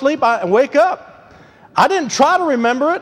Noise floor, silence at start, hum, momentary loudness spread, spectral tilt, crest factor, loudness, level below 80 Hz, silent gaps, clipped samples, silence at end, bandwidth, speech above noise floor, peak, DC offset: -44 dBFS; 0 s; none; 4 LU; -4 dB/octave; 14 dB; -15 LUFS; -58 dBFS; none; under 0.1%; 0 s; 15 kHz; 30 dB; 0 dBFS; under 0.1%